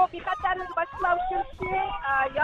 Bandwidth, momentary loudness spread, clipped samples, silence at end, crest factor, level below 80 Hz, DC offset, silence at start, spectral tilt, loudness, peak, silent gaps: 7.4 kHz; 5 LU; under 0.1%; 0 s; 16 dB; -46 dBFS; under 0.1%; 0 s; -6 dB/octave; -27 LUFS; -12 dBFS; none